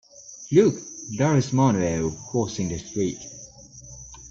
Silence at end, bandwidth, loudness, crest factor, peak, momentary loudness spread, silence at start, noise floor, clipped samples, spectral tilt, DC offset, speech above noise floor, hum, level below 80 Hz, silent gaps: 0 s; 7.8 kHz; -23 LUFS; 20 dB; -6 dBFS; 22 LU; 0.2 s; -45 dBFS; under 0.1%; -6 dB/octave; under 0.1%; 23 dB; none; -52 dBFS; none